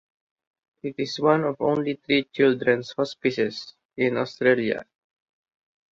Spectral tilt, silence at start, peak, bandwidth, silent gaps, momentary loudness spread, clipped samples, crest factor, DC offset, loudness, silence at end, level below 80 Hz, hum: -6 dB/octave; 0.85 s; -6 dBFS; 7.6 kHz; 3.85-3.89 s; 11 LU; under 0.1%; 20 dB; under 0.1%; -24 LUFS; 1.1 s; -66 dBFS; none